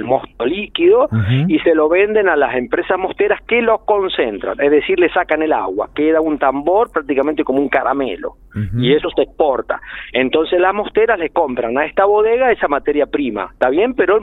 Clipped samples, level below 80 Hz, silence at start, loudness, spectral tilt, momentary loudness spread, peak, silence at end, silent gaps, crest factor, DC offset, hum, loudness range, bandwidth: under 0.1%; -44 dBFS; 0 s; -15 LUFS; -9 dB/octave; 7 LU; 0 dBFS; 0 s; none; 14 dB; under 0.1%; none; 2 LU; 4.1 kHz